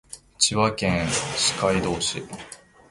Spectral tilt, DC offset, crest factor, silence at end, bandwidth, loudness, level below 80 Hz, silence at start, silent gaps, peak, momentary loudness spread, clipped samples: -3 dB/octave; under 0.1%; 20 dB; 0.35 s; 11.5 kHz; -22 LUFS; -46 dBFS; 0.1 s; none; -4 dBFS; 18 LU; under 0.1%